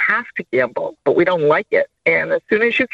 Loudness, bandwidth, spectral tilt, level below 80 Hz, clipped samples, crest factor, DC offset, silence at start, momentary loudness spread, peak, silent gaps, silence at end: -17 LUFS; 7.6 kHz; -7 dB/octave; -60 dBFS; under 0.1%; 14 dB; under 0.1%; 0 s; 6 LU; -2 dBFS; none; 0.05 s